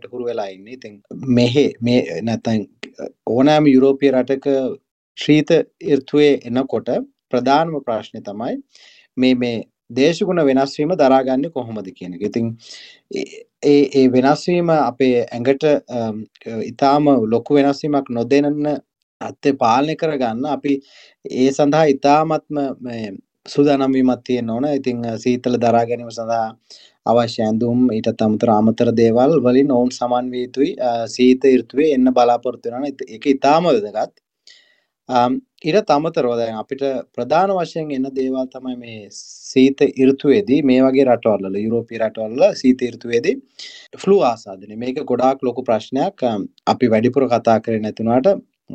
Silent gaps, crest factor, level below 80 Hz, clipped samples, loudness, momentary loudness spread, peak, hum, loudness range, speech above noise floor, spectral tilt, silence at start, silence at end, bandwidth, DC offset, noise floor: 4.91-5.15 s, 19.03-19.20 s; 16 dB; -56 dBFS; under 0.1%; -17 LUFS; 14 LU; -2 dBFS; none; 4 LU; 41 dB; -6.5 dB/octave; 0.15 s; 0 s; 8.4 kHz; under 0.1%; -58 dBFS